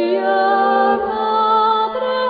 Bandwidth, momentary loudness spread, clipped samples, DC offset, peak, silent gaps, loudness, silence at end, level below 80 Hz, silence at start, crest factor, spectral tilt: 5 kHz; 4 LU; under 0.1%; under 0.1%; -4 dBFS; none; -16 LUFS; 0 s; -56 dBFS; 0 s; 12 dB; -6.5 dB/octave